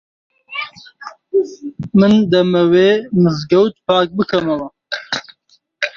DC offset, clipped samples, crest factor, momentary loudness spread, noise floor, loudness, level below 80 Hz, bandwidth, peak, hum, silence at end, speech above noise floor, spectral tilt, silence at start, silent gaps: under 0.1%; under 0.1%; 16 dB; 16 LU; -56 dBFS; -15 LUFS; -54 dBFS; 7.2 kHz; 0 dBFS; none; 0.1 s; 42 dB; -7 dB/octave; 0.5 s; none